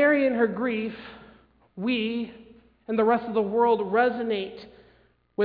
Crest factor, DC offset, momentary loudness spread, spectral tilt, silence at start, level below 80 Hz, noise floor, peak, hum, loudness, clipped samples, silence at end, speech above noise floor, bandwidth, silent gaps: 18 dB; under 0.1%; 16 LU; -9 dB/octave; 0 s; -64 dBFS; -61 dBFS; -8 dBFS; none; -25 LUFS; under 0.1%; 0 s; 36 dB; 5 kHz; none